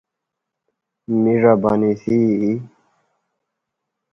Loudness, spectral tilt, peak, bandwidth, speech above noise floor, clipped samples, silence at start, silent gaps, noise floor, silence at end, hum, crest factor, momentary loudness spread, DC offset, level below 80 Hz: -17 LUFS; -10 dB/octave; 0 dBFS; 6.2 kHz; 65 dB; under 0.1%; 1.1 s; none; -81 dBFS; 1.45 s; none; 20 dB; 8 LU; under 0.1%; -56 dBFS